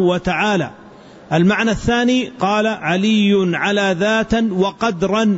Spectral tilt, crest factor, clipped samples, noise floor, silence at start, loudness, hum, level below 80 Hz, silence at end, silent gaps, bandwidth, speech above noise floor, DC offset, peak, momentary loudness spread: -5.5 dB/octave; 12 dB; under 0.1%; -40 dBFS; 0 s; -17 LUFS; none; -40 dBFS; 0 s; none; 8 kHz; 24 dB; under 0.1%; -4 dBFS; 4 LU